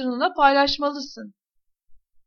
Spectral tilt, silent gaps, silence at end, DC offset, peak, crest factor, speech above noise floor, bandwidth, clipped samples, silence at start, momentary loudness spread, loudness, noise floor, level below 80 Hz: -3 dB/octave; none; 0.3 s; under 0.1%; -4 dBFS; 20 dB; 40 dB; 6.8 kHz; under 0.1%; 0 s; 19 LU; -20 LUFS; -62 dBFS; -52 dBFS